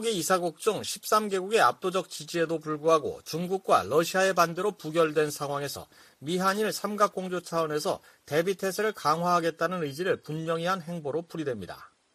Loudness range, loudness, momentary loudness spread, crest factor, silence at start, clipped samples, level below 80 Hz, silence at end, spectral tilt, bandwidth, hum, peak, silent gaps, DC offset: 3 LU; -28 LUFS; 10 LU; 20 dB; 0 s; under 0.1%; -70 dBFS; 0.3 s; -4 dB/octave; 15.5 kHz; none; -8 dBFS; none; under 0.1%